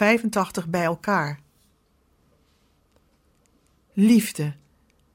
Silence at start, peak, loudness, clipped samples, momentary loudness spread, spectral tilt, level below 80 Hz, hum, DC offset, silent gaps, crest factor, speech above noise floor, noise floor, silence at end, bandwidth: 0 s; -6 dBFS; -23 LUFS; under 0.1%; 14 LU; -5.5 dB/octave; -62 dBFS; none; under 0.1%; none; 20 dB; 43 dB; -64 dBFS; 0.6 s; 16.5 kHz